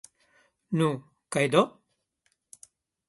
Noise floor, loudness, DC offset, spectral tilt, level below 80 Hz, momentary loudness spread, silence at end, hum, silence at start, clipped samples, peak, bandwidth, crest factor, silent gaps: -75 dBFS; -27 LUFS; under 0.1%; -5.5 dB/octave; -72 dBFS; 9 LU; 1.4 s; none; 0.7 s; under 0.1%; -6 dBFS; 11.5 kHz; 24 dB; none